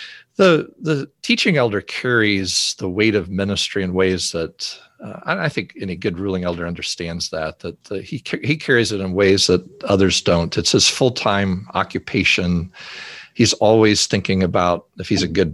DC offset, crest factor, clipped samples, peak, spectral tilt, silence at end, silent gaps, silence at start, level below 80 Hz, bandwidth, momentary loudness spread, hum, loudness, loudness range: under 0.1%; 18 dB; under 0.1%; -2 dBFS; -4 dB/octave; 0 s; none; 0 s; -40 dBFS; 12.5 kHz; 14 LU; none; -18 LUFS; 8 LU